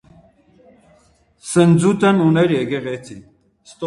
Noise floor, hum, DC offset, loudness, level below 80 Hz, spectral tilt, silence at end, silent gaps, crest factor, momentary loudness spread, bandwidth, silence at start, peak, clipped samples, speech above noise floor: -55 dBFS; none; under 0.1%; -16 LUFS; -54 dBFS; -6.5 dB/octave; 0 s; none; 16 dB; 18 LU; 11.5 kHz; 1.45 s; -2 dBFS; under 0.1%; 40 dB